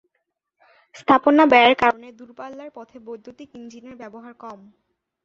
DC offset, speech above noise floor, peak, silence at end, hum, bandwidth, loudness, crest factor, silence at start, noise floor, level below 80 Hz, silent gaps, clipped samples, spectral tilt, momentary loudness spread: under 0.1%; 56 dB; -2 dBFS; 0.7 s; none; 7.4 kHz; -16 LUFS; 20 dB; 1.1 s; -76 dBFS; -62 dBFS; none; under 0.1%; -5 dB/octave; 27 LU